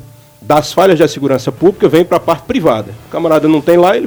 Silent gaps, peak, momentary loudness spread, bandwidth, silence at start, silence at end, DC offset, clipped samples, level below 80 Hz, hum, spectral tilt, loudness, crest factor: none; 0 dBFS; 6 LU; over 20 kHz; 0.4 s; 0 s; under 0.1%; 0.4%; -44 dBFS; none; -6 dB/octave; -11 LUFS; 12 dB